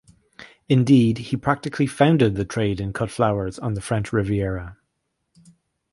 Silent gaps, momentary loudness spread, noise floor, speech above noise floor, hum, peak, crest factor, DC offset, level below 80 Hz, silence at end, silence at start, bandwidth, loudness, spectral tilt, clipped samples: none; 10 LU; -75 dBFS; 55 dB; none; -2 dBFS; 20 dB; under 0.1%; -44 dBFS; 1.2 s; 0.4 s; 11.5 kHz; -21 LUFS; -7 dB/octave; under 0.1%